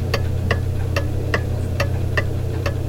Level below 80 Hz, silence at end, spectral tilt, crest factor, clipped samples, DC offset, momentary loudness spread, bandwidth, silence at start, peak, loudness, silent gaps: -32 dBFS; 0 s; -6.5 dB/octave; 18 dB; under 0.1%; 0.3%; 2 LU; 16.5 kHz; 0 s; -4 dBFS; -22 LUFS; none